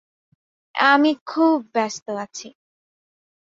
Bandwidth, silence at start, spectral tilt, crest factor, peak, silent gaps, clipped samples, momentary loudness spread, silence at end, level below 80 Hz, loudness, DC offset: 7.6 kHz; 0.75 s; -3 dB/octave; 20 dB; -2 dBFS; 1.21-1.26 s, 2.02-2.06 s; under 0.1%; 16 LU; 1 s; -72 dBFS; -20 LUFS; under 0.1%